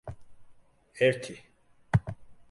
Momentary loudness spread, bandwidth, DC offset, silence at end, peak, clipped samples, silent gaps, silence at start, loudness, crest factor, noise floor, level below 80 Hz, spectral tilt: 22 LU; 11.5 kHz; under 0.1%; 0.2 s; -10 dBFS; under 0.1%; none; 0.05 s; -29 LUFS; 22 dB; -56 dBFS; -52 dBFS; -6.5 dB/octave